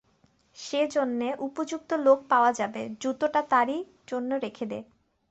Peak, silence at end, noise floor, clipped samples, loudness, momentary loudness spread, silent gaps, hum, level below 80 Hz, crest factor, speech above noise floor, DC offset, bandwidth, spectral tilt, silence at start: -8 dBFS; 0.5 s; -66 dBFS; under 0.1%; -27 LUFS; 13 LU; none; none; -72 dBFS; 20 dB; 39 dB; under 0.1%; 8.2 kHz; -4 dB/octave; 0.55 s